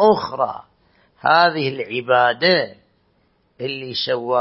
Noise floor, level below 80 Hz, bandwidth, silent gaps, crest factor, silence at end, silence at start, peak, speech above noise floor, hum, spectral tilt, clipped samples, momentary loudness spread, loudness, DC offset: -62 dBFS; -62 dBFS; 5.8 kHz; none; 18 dB; 0 s; 0 s; -2 dBFS; 44 dB; none; -8.5 dB/octave; under 0.1%; 13 LU; -18 LUFS; under 0.1%